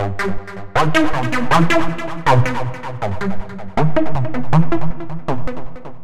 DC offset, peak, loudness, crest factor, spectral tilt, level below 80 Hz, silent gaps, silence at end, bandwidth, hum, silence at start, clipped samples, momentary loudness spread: 10%; -2 dBFS; -19 LUFS; 16 dB; -6.5 dB/octave; -34 dBFS; none; 0 s; 14 kHz; none; 0 s; under 0.1%; 12 LU